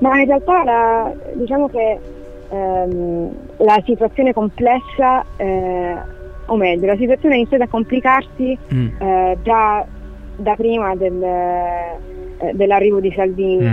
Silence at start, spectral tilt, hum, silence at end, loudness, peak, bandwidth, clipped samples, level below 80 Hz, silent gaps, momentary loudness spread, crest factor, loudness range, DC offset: 0 s; -8.5 dB/octave; none; 0 s; -16 LUFS; -2 dBFS; 6.4 kHz; under 0.1%; -36 dBFS; none; 12 LU; 14 dB; 2 LU; under 0.1%